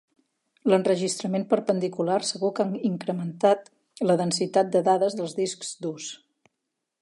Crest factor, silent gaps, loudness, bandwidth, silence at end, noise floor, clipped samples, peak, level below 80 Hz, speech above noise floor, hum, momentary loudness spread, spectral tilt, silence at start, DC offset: 18 dB; none; -25 LUFS; 11.5 kHz; 0.85 s; -82 dBFS; under 0.1%; -6 dBFS; -78 dBFS; 58 dB; none; 10 LU; -5 dB/octave; 0.65 s; under 0.1%